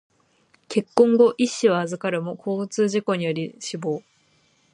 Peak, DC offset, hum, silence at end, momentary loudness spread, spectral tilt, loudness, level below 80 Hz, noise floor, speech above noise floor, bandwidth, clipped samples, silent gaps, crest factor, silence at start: -2 dBFS; under 0.1%; none; 0.75 s; 12 LU; -5.5 dB/octave; -22 LUFS; -72 dBFS; -62 dBFS; 41 dB; 10.5 kHz; under 0.1%; none; 20 dB; 0.7 s